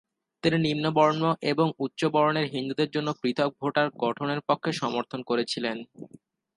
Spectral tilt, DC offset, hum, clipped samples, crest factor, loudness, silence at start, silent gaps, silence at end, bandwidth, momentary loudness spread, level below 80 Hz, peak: -6 dB/octave; under 0.1%; none; under 0.1%; 18 dB; -26 LUFS; 0.45 s; none; 0.5 s; 11.5 kHz; 7 LU; -68 dBFS; -8 dBFS